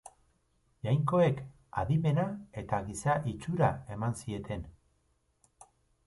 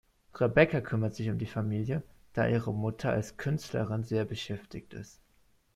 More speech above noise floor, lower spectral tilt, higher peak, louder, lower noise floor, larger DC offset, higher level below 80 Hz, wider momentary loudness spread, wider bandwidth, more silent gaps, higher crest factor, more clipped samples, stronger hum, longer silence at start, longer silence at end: first, 43 dB vs 37 dB; about the same, -7 dB/octave vs -7 dB/octave; second, -14 dBFS vs -8 dBFS; about the same, -32 LUFS vs -31 LUFS; first, -74 dBFS vs -68 dBFS; neither; about the same, -54 dBFS vs -58 dBFS; about the same, 13 LU vs 15 LU; second, 11.5 kHz vs 13 kHz; neither; about the same, 20 dB vs 22 dB; neither; neither; second, 0.05 s vs 0.35 s; second, 0.45 s vs 0.65 s